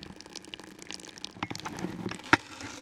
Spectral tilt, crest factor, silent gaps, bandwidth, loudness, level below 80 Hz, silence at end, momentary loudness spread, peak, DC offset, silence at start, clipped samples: -3.5 dB/octave; 32 dB; none; 17 kHz; -33 LUFS; -62 dBFS; 0 s; 17 LU; -2 dBFS; under 0.1%; 0 s; under 0.1%